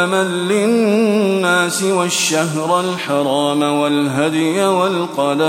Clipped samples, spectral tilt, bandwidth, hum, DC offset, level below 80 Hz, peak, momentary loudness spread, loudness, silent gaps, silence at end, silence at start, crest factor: under 0.1%; -4 dB/octave; 16.5 kHz; none; under 0.1%; -66 dBFS; -2 dBFS; 3 LU; -15 LUFS; none; 0 s; 0 s; 14 dB